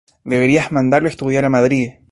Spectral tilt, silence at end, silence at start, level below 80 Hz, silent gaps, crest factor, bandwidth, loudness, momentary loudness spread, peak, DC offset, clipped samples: -6.5 dB/octave; 0.2 s; 0.25 s; -48 dBFS; none; 14 dB; 11.5 kHz; -15 LUFS; 4 LU; -2 dBFS; under 0.1%; under 0.1%